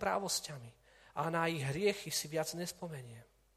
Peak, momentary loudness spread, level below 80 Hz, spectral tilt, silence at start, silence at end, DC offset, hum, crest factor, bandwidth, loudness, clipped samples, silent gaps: -18 dBFS; 17 LU; -68 dBFS; -3.5 dB/octave; 0 s; 0.35 s; under 0.1%; none; 20 dB; 15 kHz; -37 LUFS; under 0.1%; none